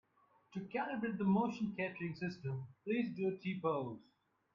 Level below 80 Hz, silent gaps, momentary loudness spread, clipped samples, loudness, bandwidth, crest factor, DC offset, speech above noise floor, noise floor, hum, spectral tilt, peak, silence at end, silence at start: -76 dBFS; none; 12 LU; under 0.1%; -39 LUFS; 7.2 kHz; 18 dB; under 0.1%; 33 dB; -72 dBFS; none; -8.5 dB/octave; -22 dBFS; 0.5 s; 0.5 s